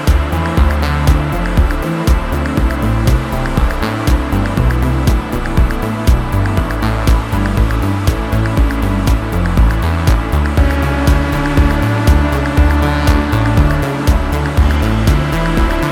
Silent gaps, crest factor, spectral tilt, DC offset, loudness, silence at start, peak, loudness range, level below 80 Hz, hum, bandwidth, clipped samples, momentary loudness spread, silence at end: none; 12 dB; -6.5 dB/octave; under 0.1%; -14 LUFS; 0 s; 0 dBFS; 2 LU; -14 dBFS; none; 17 kHz; under 0.1%; 3 LU; 0 s